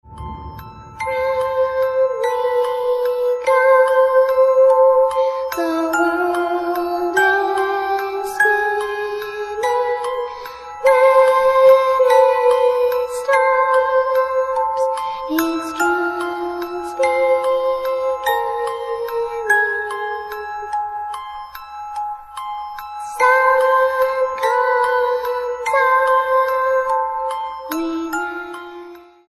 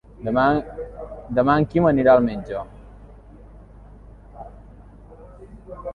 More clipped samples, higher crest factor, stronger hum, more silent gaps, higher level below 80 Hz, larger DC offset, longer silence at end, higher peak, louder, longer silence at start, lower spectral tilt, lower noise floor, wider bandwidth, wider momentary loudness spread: neither; about the same, 16 dB vs 20 dB; neither; neither; second, -50 dBFS vs -44 dBFS; neither; first, 0.25 s vs 0 s; about the same, -2 dBFS vs -4 dBFS; about the same, -17 LUFS vs -19 LUFS; about the same, 0.1 s vs 0.2 s; second, -3.5 dB/octave vs -9.5 dB/octave; second, -38 dBFS vs -44 dBFS; first, 13.5 kHz vs 5 kHz; second, 15 LU vs 25 LU